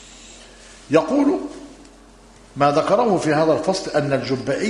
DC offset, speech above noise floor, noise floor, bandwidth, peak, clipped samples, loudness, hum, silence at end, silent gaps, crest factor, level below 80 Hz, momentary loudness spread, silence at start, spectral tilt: under 0.1%; 28 dB; -46 dBFS; 11 kHz; -2 dBFS; under 0.1%; -19 LUFS; none; 0 s; none; 20 dB; -52 dBFS; 20 LU; 0 s; -5.5 dB/octave